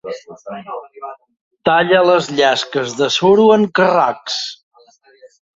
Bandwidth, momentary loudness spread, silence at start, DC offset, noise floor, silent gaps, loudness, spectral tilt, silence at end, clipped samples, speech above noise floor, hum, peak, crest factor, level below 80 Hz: 7.8 kHz; 20 LU; 0.05 s; under 0.1%; -50 dBFS; 1.41-1.51 s; -14 LUFS; -4.5 dB/octave; 1.05 s; under 0.1%; 35 dB; none; 0 dBFS; 16 dB; -60 dBFS